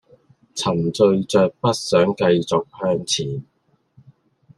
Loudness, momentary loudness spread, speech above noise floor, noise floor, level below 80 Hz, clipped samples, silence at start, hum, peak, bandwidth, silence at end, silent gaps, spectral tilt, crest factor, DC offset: -19 LUFS; 8 LU; 38 dB; -57 dBFS; -60 dBFS; under 0.1%; 0.55 s; none; -4 dBFS; 12.5 kHz; 1.15 s; none; -5 dB/octave; 18 dB; under 0.1%